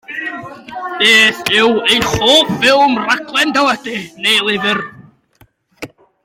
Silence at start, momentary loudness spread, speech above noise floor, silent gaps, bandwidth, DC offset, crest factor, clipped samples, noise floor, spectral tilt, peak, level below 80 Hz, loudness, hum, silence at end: 0.1 s; 20 LU; 38 dB; none; 16.5 kHz; under 0.1%; 14 dB; under 0.1%; -51 dBFS; -2.5 dB/octave; 0 dBFS; -46 dBFS; -11 LUFS; none; 0.4 s